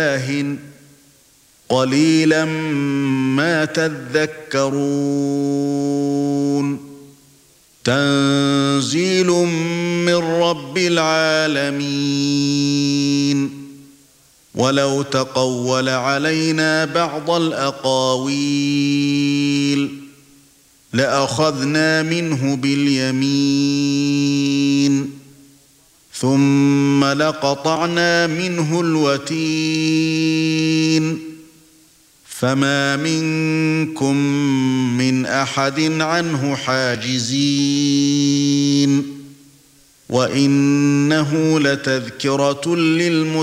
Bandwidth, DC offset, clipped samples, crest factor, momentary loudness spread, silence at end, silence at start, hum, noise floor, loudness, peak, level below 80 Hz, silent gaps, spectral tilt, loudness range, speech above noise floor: 13.5 kHz; under 0.1%; under 0.1%; 16 dB; 5 LU; 0 s; 0 s; none; -52 dBFS; -17 LUFS; -2 dBFS; -62 dBFS; none; -5 dB/octave; 3 LU; 35 dB